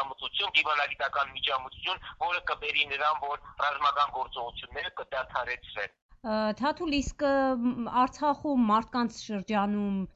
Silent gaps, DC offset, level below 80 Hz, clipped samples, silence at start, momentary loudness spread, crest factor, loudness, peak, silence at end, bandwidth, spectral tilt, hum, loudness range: 6.02-6.09 s; under 0.1%; -54 dBFS; under 0.1%; 0 s; 10 LU; 18 dB; -29 LUFS; -12 dBFS; 0.05 s; 8 kHz; -4.5 dB/octave; none; 4 LU